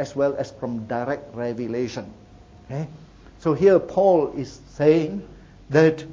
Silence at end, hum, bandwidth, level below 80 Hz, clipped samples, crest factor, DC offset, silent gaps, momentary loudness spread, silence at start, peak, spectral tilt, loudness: 0 s; none; 7.6 kHz; -52 dBFS; under 0.1%; 18 dB; under 0.1%; none; 17 LU; 0 s; -4 dBFS; -7.5 dB/octave; -22 LUFS